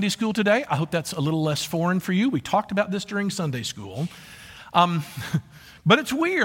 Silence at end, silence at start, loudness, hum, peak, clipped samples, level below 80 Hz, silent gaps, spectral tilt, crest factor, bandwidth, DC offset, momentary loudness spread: 0 s; 0 s; -24 LUFS; none; -4 dBFS; under 0.1%; -60 dBFS; none; -5 dB/octave; 20 dB; 17 kHz; under 0.1%; 12 LU